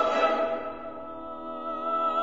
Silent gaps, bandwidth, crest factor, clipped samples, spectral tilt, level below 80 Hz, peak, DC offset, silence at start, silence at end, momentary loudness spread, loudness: none; 7.8 kHz; 18 dB; under 0.1%; -4 dB/octave; -60 dBFS; -10 dBFS; 0.4%; 0 s; 0 s; 14 LU; -30 LUFS